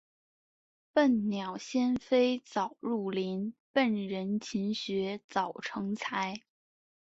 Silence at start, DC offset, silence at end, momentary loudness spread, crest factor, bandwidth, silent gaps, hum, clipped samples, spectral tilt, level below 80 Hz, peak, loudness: 0.95 s; under 0.1%; 0.8 s; 8 LU; 18 dB; 8 kHz; 3.60-3.74 s, 5.24-5.29 s; none; under 0.1%; -5.5 dB/octave; -72 dBFS; -14 dBFS; -32 LUFS